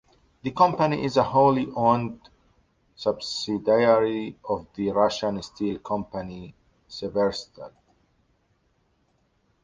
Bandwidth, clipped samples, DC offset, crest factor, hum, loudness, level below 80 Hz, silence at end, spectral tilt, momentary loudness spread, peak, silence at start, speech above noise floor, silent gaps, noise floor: 9.6 kHz; under 0.1%; under 0.1%; 20 dB; none; -24 LUFS; -58 dBFS; 1.95 s; -6 dB/octave; 16 LU; -4 dBFS; 0.45 s; 44 dB; none; -68 dBFS